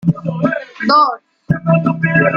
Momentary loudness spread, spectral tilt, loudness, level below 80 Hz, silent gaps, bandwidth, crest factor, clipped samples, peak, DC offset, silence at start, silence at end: 8 LU; -8.5 dB/octave; -15 LUFS; -50 dBFS; none; 5.8 kHz; 14 dB; under 0.1%; -2 dBFS; under 0.1%; 0.05 s; 0 s